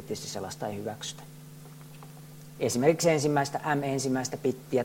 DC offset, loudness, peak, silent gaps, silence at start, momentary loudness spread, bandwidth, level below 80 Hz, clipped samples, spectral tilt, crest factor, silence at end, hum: under 0.1%; -29 LUFS; -10 dBFS; none; 0 s; 23 LU; 16.5 kHz; -66 dBFS; under 0.1%; -5 dB/octave; 20 dB; 0 s; none